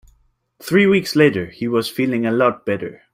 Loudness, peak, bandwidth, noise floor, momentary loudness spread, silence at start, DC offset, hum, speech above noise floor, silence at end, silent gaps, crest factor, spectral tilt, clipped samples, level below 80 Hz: -18 LUFS; -2 dBFS; 16 kHz; -60 dBFS; 10 LU; 0.6 s; under 0.1%; none; 43 dB; 0.2 s; none; 16 dB; -6 dB/octave; under 0.1%; -56 dBFS